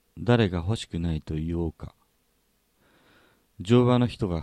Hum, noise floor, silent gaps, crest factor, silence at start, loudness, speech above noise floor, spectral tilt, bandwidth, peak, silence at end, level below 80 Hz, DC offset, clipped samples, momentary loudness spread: none; -69 dBFS; none; 20 dB; 0.15 s; -25 LUFS; 45 dB; -7.5 dB/octave; 9.8 kHz; -8 dBFS; 0 s; -44 dBFS; under 0.1%; under 0.1%; 16 LU